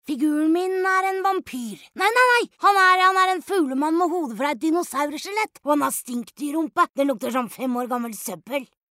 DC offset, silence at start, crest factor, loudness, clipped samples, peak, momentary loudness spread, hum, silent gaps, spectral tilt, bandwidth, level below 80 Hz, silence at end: under 0.1%; 0.1 s; 16 dB; -22 LUFS; under 0.1%; -6 dBFS; 13 LU; none; none; -2.5 dB/octave; 16 kHz; -74 dBFS; 0.3 s